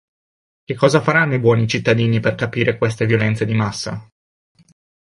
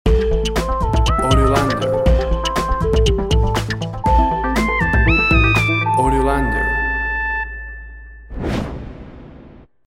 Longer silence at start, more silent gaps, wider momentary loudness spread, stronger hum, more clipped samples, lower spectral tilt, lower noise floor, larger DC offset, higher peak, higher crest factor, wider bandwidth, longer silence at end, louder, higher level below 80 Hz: first, 0.7 s vs 0.05 s; neither; second, 10 LU vs 14 LU; neither; neither; about the same, -6 dB/octave vs -5.5 dB/octave; first, under -90 dBFS vs -42 dBFS; second, under 0.1% vs 0.1%; about the same, -2 dBFS vs -2 dBFS; about the same, 16 dB vs 16 dB; second, 11.5 kHz vs 15 kHz; first, 1 s vs 0.25 s; about the same, -17 LUFS vs -17 LUFS; second, -50 dBFS vs -22 dBFS